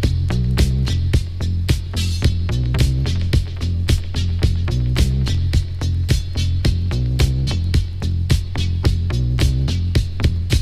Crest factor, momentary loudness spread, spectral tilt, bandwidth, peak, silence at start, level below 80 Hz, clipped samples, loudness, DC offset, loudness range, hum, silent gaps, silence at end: 14 dB; 3 LU; -6 dB/octave; 14 kHz; -2 dBFS; 0 s; -22 dBFS; under 0.1%; -20 LUFS; under 0.1%; 1 LU; none; none; 0 s